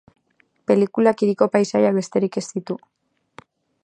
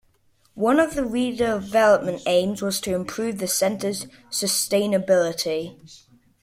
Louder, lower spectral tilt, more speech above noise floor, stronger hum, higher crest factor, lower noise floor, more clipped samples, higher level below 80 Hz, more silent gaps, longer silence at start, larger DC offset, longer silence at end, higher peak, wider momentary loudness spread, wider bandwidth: about the same, -20 LUFS vs -22 LUFS; first, -6.5 dB/octave vs -3.5 dB/octave; first, 45 dB vs 40 dB; neither; about the same, 20 dB vs 18 dB; about the same, -64 dBFS vs -62 dBFS; neither; second, -68 dBFS vs -54 dBFS; neither; first, 0.7 s vs 0.55 s; neither; first, 1.05 s vs 0.45 s; first, -2 dBFS vs -6 dBFS; first, 13 LU vs 9 LU; second, 9.8 kHz vs 16 kHz